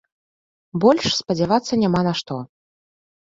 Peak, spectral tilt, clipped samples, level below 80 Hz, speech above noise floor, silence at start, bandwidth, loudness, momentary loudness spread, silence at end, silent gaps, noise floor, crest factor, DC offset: -2 dBFS; -5.5 dB/octave; under 0.1%; -54 dBFS; over 71 dB; 0.75 s; 7.8 kHz; -19 LUFS; 14 LU; 0.8 s; none; under -90 dBFS; 20 dB; under 0.1%